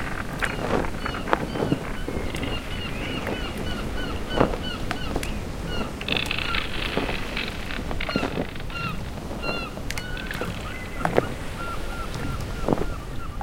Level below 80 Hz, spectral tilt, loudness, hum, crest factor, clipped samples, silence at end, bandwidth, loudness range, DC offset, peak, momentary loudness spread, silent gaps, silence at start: -34 dBFS; -5 dB/octave; -28 LUFS; none; 28 dB; under 0.1%; 0 s; 17 kHz; 3 LU; under 0.1%; 0 dBFS; 7 LU; none; 0 s